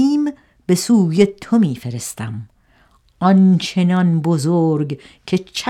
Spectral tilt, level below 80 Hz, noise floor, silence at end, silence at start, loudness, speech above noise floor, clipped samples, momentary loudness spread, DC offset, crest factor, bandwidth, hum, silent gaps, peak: -6.5 dB/octave; -56 dBFS; -55 dBFS; 0 s; 0 s; -17 LUFS; 39 dB; under 0.1%; 14 LU; under 0.1%; 16 dB; 14.5 kHz; none; none; 0 dBFS